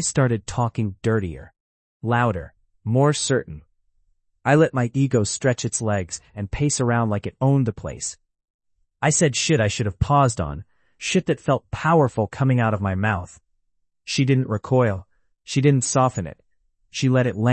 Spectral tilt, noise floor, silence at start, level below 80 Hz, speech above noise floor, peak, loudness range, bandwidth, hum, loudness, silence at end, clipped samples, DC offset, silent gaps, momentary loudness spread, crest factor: -5.5 dB/octave; -72 dBFS; 0 s; -46 dBFS; 52 dB; -4 dBFS; 3 LU; 8.8 kHz; none; -21 LUFS; 0 s; under 0.1%; under 0.1%; 1.60-2.00 s, 8.50-8.59 s; 13 LU; 18 dB